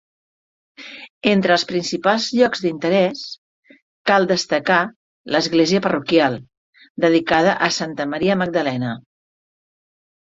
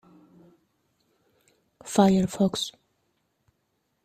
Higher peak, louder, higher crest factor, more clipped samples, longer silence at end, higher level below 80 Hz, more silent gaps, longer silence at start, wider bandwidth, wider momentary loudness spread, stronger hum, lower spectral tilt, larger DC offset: first, -2 dBFS vs -6 dBFS; first, -18 LUFS vs -24 LUFS; about the same, 18 dB vs 22 dB; neither; about the same, 1.25 s vs 1.35 s; about the same, -60 dBFS vs -62 dBFS; first, 1.10-1.21 s, 3.38-3.63 s, 3.82-4.05 s, 4.96-5.25 s, 6.57-6.73 s, 6.90-6.95 s vs none; second, 0.8 s vs 1.85 s; second, 7.8 kHz vs 14.5 kHz; first, 16 LU vs 13 LU; neither; about the same, -4.5 dB/octave vs -5.5 dB/octave; neither